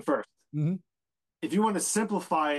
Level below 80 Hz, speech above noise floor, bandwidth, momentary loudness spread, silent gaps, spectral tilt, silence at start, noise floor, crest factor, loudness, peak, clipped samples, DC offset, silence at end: -78 dBFS; over 62 dB; 12.5 kHz; 12 LU; none; -5 dB/octave; 0 s; under -90 dBFS; 14 dB; -29 LUFS; -16 dBFS; under 0.1%; under 0.1%; 0 s